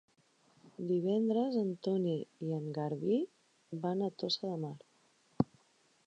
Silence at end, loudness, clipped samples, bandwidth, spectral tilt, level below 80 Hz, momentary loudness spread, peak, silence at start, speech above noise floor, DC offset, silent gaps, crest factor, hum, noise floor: 0.65 s; -36 LUFS; under 0.1%; 9.2 kHz; -7.5 dB/octave; -72 dBFS; 13 LU; -14 dBFS; 0.65 s; 36 dB; under 0.1%; none; 22 dB; none; -70 dBFS